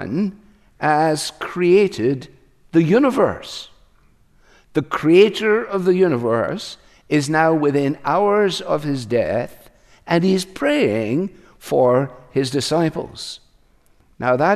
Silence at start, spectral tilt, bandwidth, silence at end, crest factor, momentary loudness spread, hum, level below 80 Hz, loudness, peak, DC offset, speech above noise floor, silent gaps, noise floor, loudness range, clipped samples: 0 s; -6 dB/octave; 14 kHz; 0 s; 18 dB; 14 LU; none; -54 dBFS; -18 LUFS; -2 dBFS; under 0.1%; 37 dB; none; -55 dBFS; 3 LU; under 0.1%